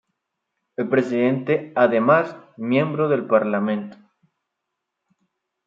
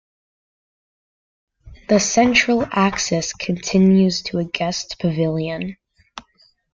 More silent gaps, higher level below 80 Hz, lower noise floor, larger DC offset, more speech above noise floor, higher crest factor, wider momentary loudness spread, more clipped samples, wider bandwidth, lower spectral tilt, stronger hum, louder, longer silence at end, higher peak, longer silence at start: neither; second, -72 dBFS vs -48 dBFS; first, -81 dBFS vs -58 dBFS; neither; first, 61 dB vs 40 dB; about the same, 20 dB vs 18 dB; first, 13 LU vs 10 LU; neither; about the same, 7.4 kHz vs 7.6 kHz; first, -8.5 dB/octave vs -4.5 dB/octave; neither; about the same, -20 LUFS vs -18 LUFS; first, 1.7 s vs 0.55 s; about the same, -2 dBFS vs -2 dBFS; second, 0.8 s vs 1.65 s